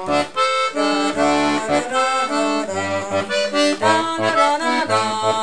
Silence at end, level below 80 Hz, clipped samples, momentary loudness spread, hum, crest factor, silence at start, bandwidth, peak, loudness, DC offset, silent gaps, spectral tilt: 0 s; -54 dBFS; under 0.1%; 4 LU; none; 16 dB; 0 s; 10.5 kHz; -2 dBFS; -18 LUFS; 0.8%; none; -3.5 dB/octave